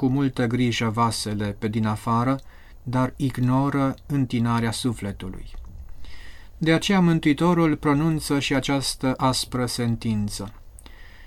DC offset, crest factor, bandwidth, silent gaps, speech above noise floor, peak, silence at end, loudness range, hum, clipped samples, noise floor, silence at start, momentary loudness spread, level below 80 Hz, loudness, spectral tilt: under 0.1%; 16 dB; 17 kHz; none; 20 dB; -6 dBFS; 0 s; 4 LU; none; under 0.1%; -43 dBFS; 0 s; 12 LU; -42 dBFS; -23 LUFS; -5.5 dB/octave